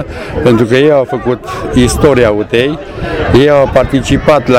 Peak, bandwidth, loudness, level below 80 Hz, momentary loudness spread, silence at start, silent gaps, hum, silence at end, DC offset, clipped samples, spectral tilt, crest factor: 0 dBFS; 16 kHz; -10 LUFS; -26 dBFS; 9 LU; 0 s; none; none; 0 s; 0.5%; 0.8%; -6 dB/octave; 10 dB